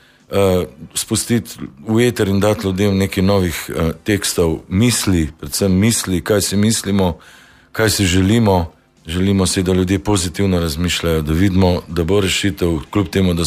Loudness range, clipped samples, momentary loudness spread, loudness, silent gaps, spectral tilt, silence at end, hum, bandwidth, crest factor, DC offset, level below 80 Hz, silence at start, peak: 1 LU; under 0.1%; 6 LU; -16 LUFS; none; -5 dB/octave; 0 s; none; 15.5 kHz; 14 dB; under 0.1%; -34 dBFS; 0.3 s; -4 dBFS